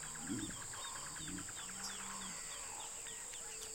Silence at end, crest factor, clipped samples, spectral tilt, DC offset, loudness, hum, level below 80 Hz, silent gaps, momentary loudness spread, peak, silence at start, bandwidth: 0 s; 16 dB; under 0.1%; -1.5 dB/octave; under 0.1%; -44 LUFS; none; -64 dBFS; none; 2 LU; -30 dBFS; 0 s; 16.5 kHz